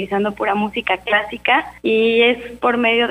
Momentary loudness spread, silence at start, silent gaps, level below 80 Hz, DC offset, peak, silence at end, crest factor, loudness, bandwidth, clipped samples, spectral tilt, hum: 6 LU; 0 s; none; -50 dBFS; under 0.1%; -2 dBFS; 0 s; 16 dB; -17 LUFS; 11 kHz; under 0.1%; -5.5 dB/octave; none